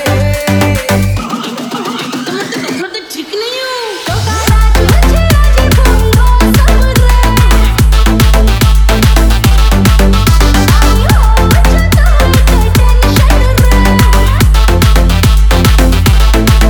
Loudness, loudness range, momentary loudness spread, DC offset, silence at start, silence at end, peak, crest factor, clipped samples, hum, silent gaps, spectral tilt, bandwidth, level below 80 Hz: -9 LUFS; 6 LU; 9 LU; under 0.1%; 0 s; 0 s; 0 dBFS; 6 dB; 0.4%; none; none; -5 dB/octave; 19.5 kHz; -8 dBFS